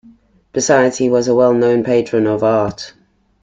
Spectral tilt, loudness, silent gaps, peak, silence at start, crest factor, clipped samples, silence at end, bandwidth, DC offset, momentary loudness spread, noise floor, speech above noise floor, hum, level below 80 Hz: -5 dB/octave; -14 LUFS; none; -2 dBFS; 0.55 s; 14 dB; under 0.1%; 0.55 s; 9.4 kHz; under 0.1%; 11 LU; -47 dBFS; 34 dB; none; -52 dBFS